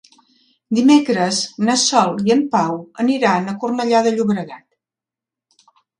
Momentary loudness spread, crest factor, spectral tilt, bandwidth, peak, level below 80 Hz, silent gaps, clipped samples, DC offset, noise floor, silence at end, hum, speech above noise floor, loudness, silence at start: 9 LU; 18 dB; -4 dB/octave; 11 kHz; 0 dBFS; -66 dBFS; none; under 0.1%; under 0.1%; -88 dBFS; 1.4 s; none; 72 dB; -17 LUFS; 0.7 s